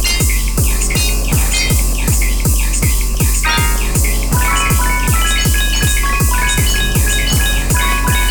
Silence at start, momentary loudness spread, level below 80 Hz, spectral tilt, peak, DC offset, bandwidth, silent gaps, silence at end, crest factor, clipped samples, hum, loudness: 0 s; 2 LU; -16 dBFS; -3 dB/octave; -2 dBFS; under 0.1%; 19.5 kHz; none; 0 s; 10 dB; under 0.1%; none; -14 LUFS